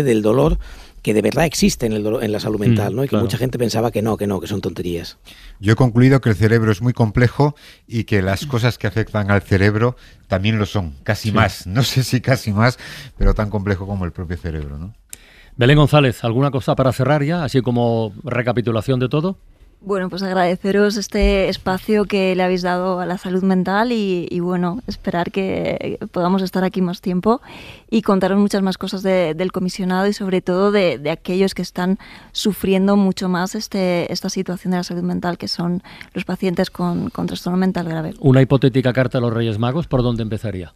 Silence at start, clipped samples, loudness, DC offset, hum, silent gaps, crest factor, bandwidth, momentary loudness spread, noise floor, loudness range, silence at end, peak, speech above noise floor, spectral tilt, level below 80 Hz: 0 s; under 0.1%; -18 LUFS; under 0.1%; none; none; 16 dB; 15.5 kHz; 10 LU; -42 dBFS; 4 LU; 0.05 s; -2 dBFS; 24 dB; -6.5 dB/octave; -34 dBFS